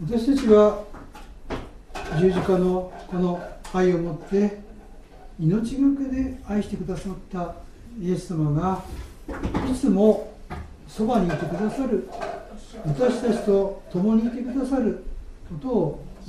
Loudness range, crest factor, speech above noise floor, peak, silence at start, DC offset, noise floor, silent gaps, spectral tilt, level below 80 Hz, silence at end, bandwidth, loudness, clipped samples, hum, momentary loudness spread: 3 LU; 20 dB; 21 dB; -4 dBFS; 0 s; under 0.1%; -44 dBFS; none; -8 dB/octave; -40 dBFS; 0 s; 13 kHz; -24 LUFS; under 0.1%; none; 18 LU